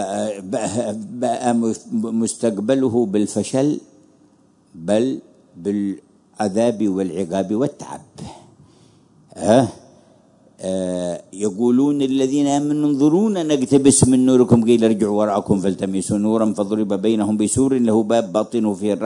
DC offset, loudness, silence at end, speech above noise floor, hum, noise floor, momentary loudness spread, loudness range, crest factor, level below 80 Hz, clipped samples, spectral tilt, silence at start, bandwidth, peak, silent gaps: under 0.1%; -19 LUFS; 0 s; 37 dB; none; -54 dBFS; 11 LU; 8 LU; 18 dB; -56 dBFS; under 0.1%; -6 dB/octave; 0 s; 11 kHz; 0 dBFS; none